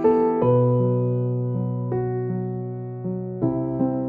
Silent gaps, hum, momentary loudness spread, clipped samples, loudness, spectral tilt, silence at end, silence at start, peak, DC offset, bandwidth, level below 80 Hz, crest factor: none; none; 11 LU; under 0.1%; -23 LUFS; -13 dB/octave; 0 s; 0 s; -8 dBFS; under 0.1%; 3.2 kHz; -54 dBFS; 14 dB